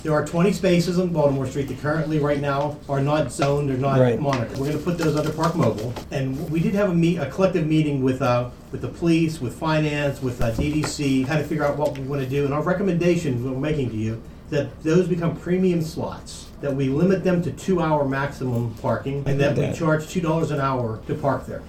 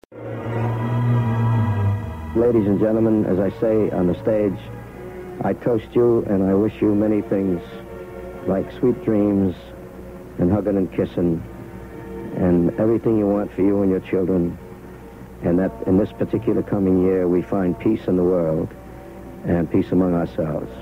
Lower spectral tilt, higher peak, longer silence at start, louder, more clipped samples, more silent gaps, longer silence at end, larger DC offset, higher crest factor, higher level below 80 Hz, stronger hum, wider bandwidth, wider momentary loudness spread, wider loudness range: second, -7 dB/octave vs -10 dB/octave; about the same, -4 dBFS vs -6 dBFS; about the same, 0 s vs 0.1 s; second, -23 LUFS vs -20 LUFS; neither; neither; about the same, 0 s vs 0 s; neither; about the same, 18 dB vs 14 dB; about the same, -42 dBFS vs -44 dBFS; neither; about the same, 15.5 kHz vs 16 kHz; second, 7 LU vs 17 LU; about the same, 2 LU vs 3 LU